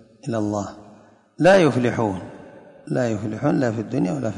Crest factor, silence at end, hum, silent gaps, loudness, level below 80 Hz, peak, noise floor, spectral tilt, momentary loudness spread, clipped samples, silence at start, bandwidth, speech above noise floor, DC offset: 16 dB; 0 s; none; none; -21 LUFS; -54 dBFS; -6 dBFS; -50 dBFS; -6.5 dB/octave; 13 LU; under 0.1%; 0.25 s; 11 kHz; 30 dB; under 0.1%